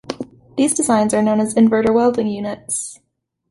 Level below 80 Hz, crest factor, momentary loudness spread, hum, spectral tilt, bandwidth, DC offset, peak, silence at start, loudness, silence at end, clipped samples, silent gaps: -54 dBFS; 14 dB; 14 LU; none; -4.5 dB/octave; 11.5 kHz; under 0.1%; -4 dBFS; 0.1 s; -17 LUFS; 0.55 s; under 0.1%; none